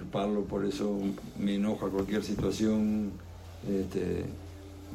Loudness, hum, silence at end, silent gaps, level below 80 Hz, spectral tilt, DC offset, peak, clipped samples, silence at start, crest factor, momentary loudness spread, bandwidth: -32 LUFS; none; 0 s; none; -52 dBFS; -6.5 dB/octave; under 0.1%; -18 dBFS; under 0.1%; 0 s; 14 dB; 15 LU; 15 kHz